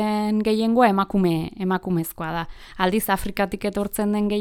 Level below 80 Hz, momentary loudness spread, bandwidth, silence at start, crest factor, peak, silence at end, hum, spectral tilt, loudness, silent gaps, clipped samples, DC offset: -44 dBFS; 10 LU; 18.5 kHz; 0 s; 18 dB; -4 dBFS; 0 s; none; -6 dB/octave; -22 LUFS; none; under 0.1%; under 0.1%